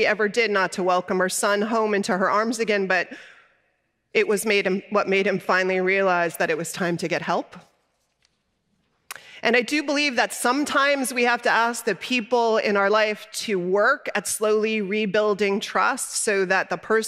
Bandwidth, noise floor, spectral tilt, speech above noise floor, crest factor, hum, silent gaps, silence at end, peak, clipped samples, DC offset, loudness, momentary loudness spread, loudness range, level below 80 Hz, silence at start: 16 kHz; -71 dBFS; -3.5 dB/octave; 49 dB; 18 dB; none; none; 0 s; -6 dBFS; under 0.1%; under 0.1%; -22 LUFS; 6 LU; 5 LU; -72 dBFS; 0 s